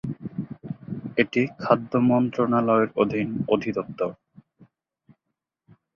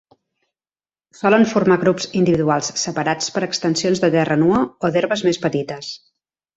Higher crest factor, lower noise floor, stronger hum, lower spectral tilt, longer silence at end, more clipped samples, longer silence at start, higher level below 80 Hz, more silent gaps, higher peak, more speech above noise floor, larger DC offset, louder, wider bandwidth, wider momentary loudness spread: about the same, 22 dB vs 18 dB; second, -82 dBFS vs under -90 dBFS; neither; first, -8.5 dB/octave vs -5 dB/octave; first, 1.3 s vs 0.6 s; neither; second, 0.05 s vs 1.2 s; second, -62 dBFS vs -56 dBFS; neither; about the same, -4 dBFS vs -2 dBFS; second, 60 dB vs over 72 dB; neither; second, -24 LUFS vs -18 LUFS; second, 6.8 kHz vs 8.2 kHz; first, 14 LU vs 7 LU